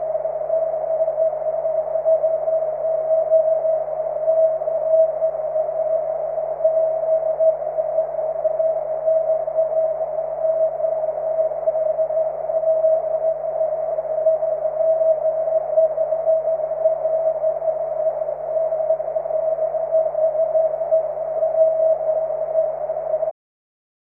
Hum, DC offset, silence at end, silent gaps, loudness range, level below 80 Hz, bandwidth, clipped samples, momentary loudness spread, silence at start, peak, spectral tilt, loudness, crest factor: none; under 0.1%; 0.8 s; none; 2 LU; -58 dBFS; 2.4 kHz; under 0.1%; 5 LU; 0 s; -6 dBFS; -9.5 dB/octave; -21 LUFS; 14 dB